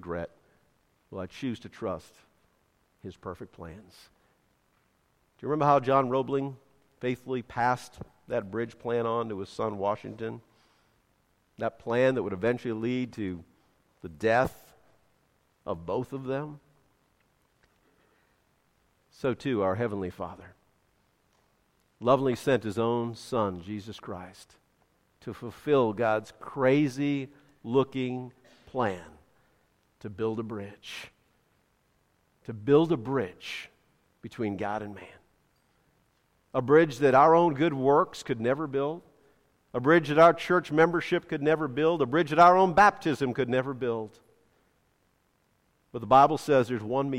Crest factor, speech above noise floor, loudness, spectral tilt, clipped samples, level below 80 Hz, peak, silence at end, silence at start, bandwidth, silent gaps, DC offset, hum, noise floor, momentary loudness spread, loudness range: 22 dB; 44 dB; -27 LUFS; -6.5 dB/octave; under 0.1%; -64 dBFS; -6 dBFS; 0 s; 0.05 s; 15.5 kHz; none; under 0.1%; none; -71 dBFS; 22 LU; 14 LU